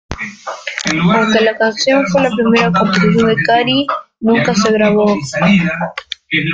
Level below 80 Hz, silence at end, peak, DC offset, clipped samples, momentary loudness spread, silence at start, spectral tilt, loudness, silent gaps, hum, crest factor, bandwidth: -44 dBFS; 0 s; 0 dBFS; under 0.1%; under 0.1%; 11 LU; 0.1 s; -5 dB/octave; -13 LUFS; none; none; 12 dB; 7.8 kHz